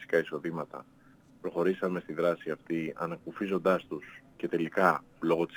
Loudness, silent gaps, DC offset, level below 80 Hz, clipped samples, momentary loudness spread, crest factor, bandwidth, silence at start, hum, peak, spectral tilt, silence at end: -32 LUFS; none; under 0.1%; -72 dBFS; under 0.1%; 15 LU; 24 dB; over 20 kHz; 0 s; none; -8 dBFS; -7 dB/octave; 0 s